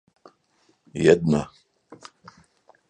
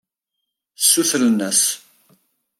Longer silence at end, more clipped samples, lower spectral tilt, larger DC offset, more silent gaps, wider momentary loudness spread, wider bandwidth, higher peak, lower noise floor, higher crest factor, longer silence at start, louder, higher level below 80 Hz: about the same, 0.95 s vs 0.85 s; neither; first, -6.5 dB/octave vs -1.5 dB/octave; neither; neither; first, 22 LU vs 6 LU; second, 9.4 kHz vs 16.5 kHz; about the same, -2 dBFS vs -2 dBFS; second, -65 dBFS vs -79 dBFS; about the same, 24 dB vs 20 dB; first, 0.95 s vs 0.8 s; second, -21 LUFS vs -16 LUFS; first, -54 dBFS vs -74 dBFS